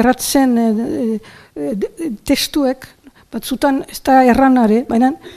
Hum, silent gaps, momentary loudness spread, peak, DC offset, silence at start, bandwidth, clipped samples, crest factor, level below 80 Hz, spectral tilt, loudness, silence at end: none; none; 15 LU; 0 dBFS; under 0.1%; 0 s; 15.5 kHz; under 0.1%; 14 dB; -42 dBFS; -4.5 dB/octave; -15 LUFS; 0 s